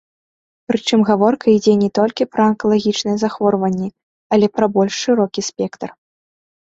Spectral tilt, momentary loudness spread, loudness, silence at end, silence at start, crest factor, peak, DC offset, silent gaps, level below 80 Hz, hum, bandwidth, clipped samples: -5.5 dB/octave; 10 LU; -16 LUFS; 0.75 s; 0.7 s; 16 dB; -2 dBFS; under 0.1%; 4.03-4.30 s; -58 dBFS; none; 7.8 kHz; under 0.1%